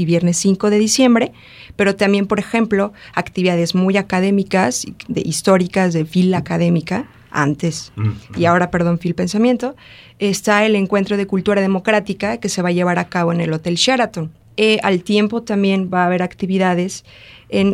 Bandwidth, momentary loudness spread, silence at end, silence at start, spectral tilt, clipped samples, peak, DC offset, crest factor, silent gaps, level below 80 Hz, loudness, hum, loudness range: 15 kHz; 8 LU; 0 s; 0 s; -5 dB/octave; under 0.1%; 0 dBFS; under 0.1%; 16 dB; none; -50 dBFS; -17 LUFS; none; 1 LU